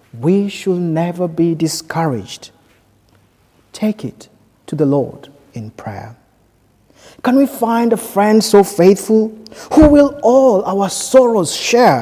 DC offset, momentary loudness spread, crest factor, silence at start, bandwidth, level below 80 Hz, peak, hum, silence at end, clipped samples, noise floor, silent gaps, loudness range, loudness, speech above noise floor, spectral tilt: under 0.1%; 19 LU; 14 dB; 0.15 s; 16 kHz; -36 dBFS; 0 dBFS; none; 0 s; 0.1%; -54 dBFS; none; 11 LU; -13 LUFS; 41 dB; -5.5 dB/octave